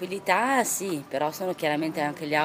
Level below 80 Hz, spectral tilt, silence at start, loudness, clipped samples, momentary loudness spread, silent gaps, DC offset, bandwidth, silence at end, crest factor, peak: -72 dBFS; -3.5 dB/octave; 0 s; -26 LUFS; under 0.1%; 7 LU; none; under 0.1%; 16 kHz; 0 s; 20 dB; -6 dBFS